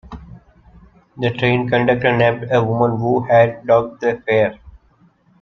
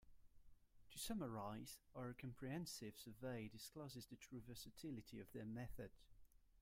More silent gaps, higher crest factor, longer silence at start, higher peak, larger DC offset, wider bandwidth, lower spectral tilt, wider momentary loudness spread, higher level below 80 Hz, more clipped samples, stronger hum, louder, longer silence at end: neither; about the same, 16 dB vs 18 dB; about the same, 0.1 s vs 0 s; first, -2 dBFS vs -36 dBFS; neither; second, 6.4 kHz vs 16 kHz; first, -8 dB/octave vs -5 dB/octave; about the same, 8 LU vs 8 LU; first, -48 dBFS vs -70 dBFS; neither; neither; first, -16 LUFS vs -54 LUFS; first, 0.7 s vs 0 s